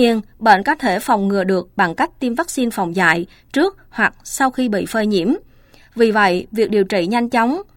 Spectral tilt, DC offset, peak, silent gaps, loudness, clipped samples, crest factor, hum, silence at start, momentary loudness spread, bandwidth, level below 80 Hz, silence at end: -5 dB/octave; under 0.1%; 0 dBFS; none; -17 LUFS; under 0.1%; 18 dB; none; 0 s; 6 LU; 17 kHz; -50 dBFS; 0.15 s